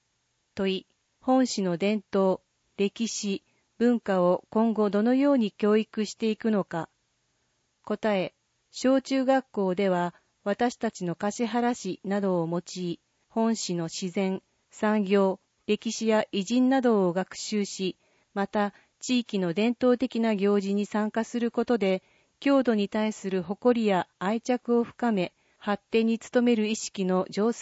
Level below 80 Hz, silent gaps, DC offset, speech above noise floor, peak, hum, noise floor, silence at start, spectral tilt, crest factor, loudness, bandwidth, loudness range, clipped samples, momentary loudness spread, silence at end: -70 dBFS; none; under 0.1%; 49 dB; -12 dBFS; none; -74 dBFS; 0.55 s; -5.5 dB/octave; 16 dB; -27 LUFS; 8 kHz; 4 LU; under 0.1%; 9 LU; 0 s